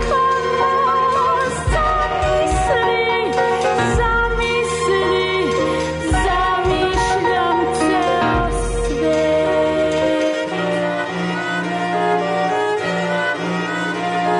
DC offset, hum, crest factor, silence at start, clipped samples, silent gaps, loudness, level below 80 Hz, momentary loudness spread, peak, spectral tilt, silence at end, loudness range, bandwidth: under 0.1%; none; 10 dB; 0 s; under 0.1%; none; -18 LUFS; -30 dBFS; 4 LU; -8 dBFS; -5 dB/octave; 0 s; 3 LU; 11 kHz